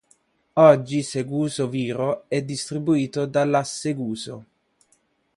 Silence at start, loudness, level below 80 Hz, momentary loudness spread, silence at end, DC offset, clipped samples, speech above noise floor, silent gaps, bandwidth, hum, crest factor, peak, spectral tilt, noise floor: 0.55 s; -22 LUFS; -64 dBFS; 13 LU; 0.95 s; under 0.1%; under 0.1%; 44 dB; none; 11.5 kHz; none; 22 dB; -2 dBFS; -6 dB/octave; -65 dBFS